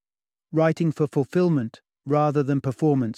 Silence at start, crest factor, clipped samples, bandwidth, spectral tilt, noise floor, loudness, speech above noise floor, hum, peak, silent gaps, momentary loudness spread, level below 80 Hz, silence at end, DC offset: 0.5 s; 16 dB; under 0.1%; 10.5 kHz; -8.5 dB/octave; under -90 dBFS; -23 LUFS; over 68 dB; none; -8 dBFS; none; 6 LU; -66 dBFS; 0.05 s; under 0.1%